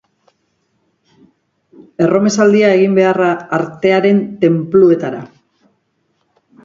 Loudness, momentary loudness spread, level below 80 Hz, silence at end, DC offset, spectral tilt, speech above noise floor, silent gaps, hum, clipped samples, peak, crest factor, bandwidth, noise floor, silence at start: -12 LUFS; 8 LU; -58 dBFS; 1.4 s; under 0.1%; -6.5 dB/octave; 52 dB; none; none; under 0.1%; 0 dBFS; 14 dB; 7.6 kHz; -64 dBFS; 2 s